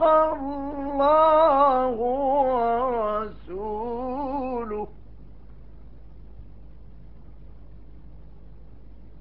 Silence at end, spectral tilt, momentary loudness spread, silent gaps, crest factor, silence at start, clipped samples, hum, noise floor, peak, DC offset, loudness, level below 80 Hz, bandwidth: 0.15 s; -4.5 dB/octave; 15 LU; none; 18 dB; 0 s; under 0.1%; 50 Hz at -60 dBFS; -47 dBFS; -8 dBFS; 0.8%; -23 LUFS; -46 dBFS; 5.4 kHz